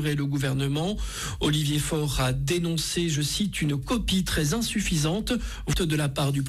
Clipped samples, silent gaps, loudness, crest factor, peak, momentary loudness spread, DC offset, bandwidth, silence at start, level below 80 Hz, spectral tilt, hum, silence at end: under 0.1%; none; -26 LUFS; 12 dB; -14 dBFS; 3 LU; under 0.1%; 16 kHz; 0 s; -38 dBFS; -4.5 dB/octave; none; 0 s